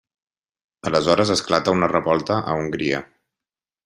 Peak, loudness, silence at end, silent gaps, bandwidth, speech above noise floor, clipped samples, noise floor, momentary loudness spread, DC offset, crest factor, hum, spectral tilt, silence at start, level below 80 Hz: -2 dBFS; -20 LUFS; 0.8 s; none; 12 kHz; 70 dB; under 0.1%; -90 dBFS; 7 LU; under 0.1%; 20 dB; none; -5 dB/octave; 0.85 s; -54 dBFS